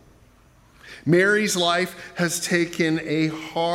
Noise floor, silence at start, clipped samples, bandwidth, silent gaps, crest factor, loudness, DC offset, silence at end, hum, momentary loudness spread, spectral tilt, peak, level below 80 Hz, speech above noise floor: -54 dBFS; 0.85 s; under 0.1%; 16.5 kHz; none; 18 dB; -22 LUFS; under 0.1%; 0 s; none; 8 LU; -4 dB/octave; -6 dBFS; -60 dBFS; 32 dB